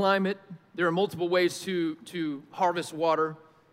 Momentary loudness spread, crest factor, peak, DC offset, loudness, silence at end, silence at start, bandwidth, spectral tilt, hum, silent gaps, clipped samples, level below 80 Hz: 9 LU; 16 dB; -12 dBFS; under 0.1%; -28 LUFS; 0.35 s; 0 s; 16 kHz; -5 dB/octave; none; none; under 0.1%; -78 dBFS